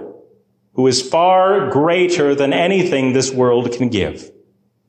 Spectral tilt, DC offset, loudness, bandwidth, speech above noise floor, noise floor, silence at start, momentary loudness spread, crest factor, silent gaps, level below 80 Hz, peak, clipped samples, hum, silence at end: -4.5 dB/octave; under 0.1%; -15 LUFS; 10 kHz; 42 dB; -56 dBFS; 0 s; 6 LU; 12 dB; none; -48 dBFS; -4 dBFS; under 0.1%; none; 0.6 s